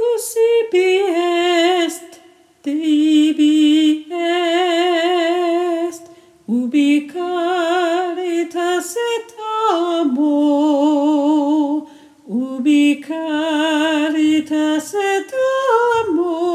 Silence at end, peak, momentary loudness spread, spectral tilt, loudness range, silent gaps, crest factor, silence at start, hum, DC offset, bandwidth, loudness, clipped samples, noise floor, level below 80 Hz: 0 s; -4 dBFS; 8 LU; -3 dB/octave; 3 LU; none; 14 dB; 0 s; none; under 0.1%; 14.5 kHz; -17 LUFS; under 0.1%; -47 dBFS; -70 dBFS